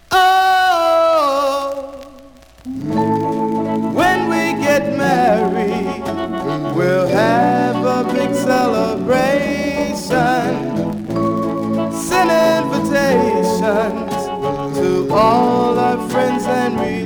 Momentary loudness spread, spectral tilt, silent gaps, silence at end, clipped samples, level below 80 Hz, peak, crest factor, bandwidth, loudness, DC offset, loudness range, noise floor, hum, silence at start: 8 LU; -5.5 dB/octave; none; 0 s; under 0.1%; -46 dBFS; -2 dBFS; 14 dB; over 20 kHz; -16 LUFS; under 0.1%; 2 LU; -42 dBFS; none; 0.1 s